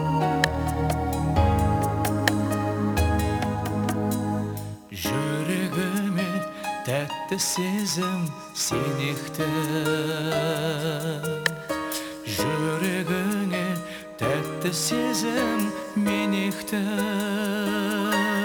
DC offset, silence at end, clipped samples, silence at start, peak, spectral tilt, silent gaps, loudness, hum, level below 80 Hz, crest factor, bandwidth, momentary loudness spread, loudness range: under 0.1%; 0 s; under 0.1%; 0 s; -2 dBFS; -5 dB/octave; none; -26 LUFS; none; -40 dBFS; 24 dB; over 20 kHz; 6 LU; 3 LU